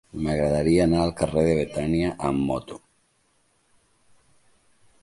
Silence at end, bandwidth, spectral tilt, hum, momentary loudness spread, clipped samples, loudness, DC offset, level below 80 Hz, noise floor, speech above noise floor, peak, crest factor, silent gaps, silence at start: 2.25 s; 11.5 kHz; -7 dB/octave; none; 9 LU; under 0.1%; -23 LUFS; under 0.1%; -42 dBFS; -66 dBFS; 44 dB; -6 dBFS; 18 dB; none; 0.15 s